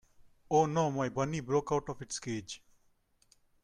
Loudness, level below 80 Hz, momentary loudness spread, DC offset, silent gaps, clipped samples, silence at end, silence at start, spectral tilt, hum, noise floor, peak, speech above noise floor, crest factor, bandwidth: -33 LUFS; -62 dBFS; 11 LU; under 0.1%; none; under 0.1%; 1.05 s; 0.5 s; -5.5 dB/octave; none; -70 dBFS; -16 dBFS; 38 dB; 20 dB; 11.5 kHz